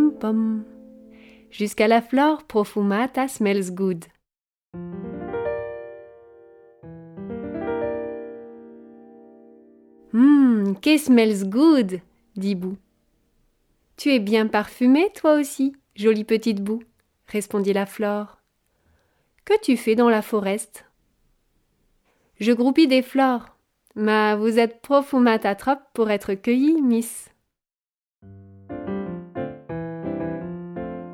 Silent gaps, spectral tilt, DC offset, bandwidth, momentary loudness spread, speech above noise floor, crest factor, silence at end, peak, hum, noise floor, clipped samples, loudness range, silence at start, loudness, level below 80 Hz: 4.57-4.62 s, 27.94-28.06 s; -5.5 dB/octave; under 0.1%; 16.5 kHz; 17 LU; over 70 dB; 18 dB; 0 s; -6 dBFS; none; under -90 dBFS; under 0.1%; 14 LU; 0 s; -21 LUFS; -60 dBFS